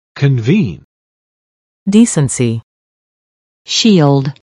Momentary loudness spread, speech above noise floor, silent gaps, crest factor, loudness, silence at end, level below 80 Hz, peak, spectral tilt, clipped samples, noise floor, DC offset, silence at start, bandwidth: 12 LU; over 79 dB; 0.84-1.86 s, 2.63-3.65 s; 14 dB; -12 LUFS; 0.3 s; -50 dBFS; 0 dBFS; -5.5 dB/octave; 0.1%; under -90 dBFS; under 0.1%; 0.15 s; 11.5 kHz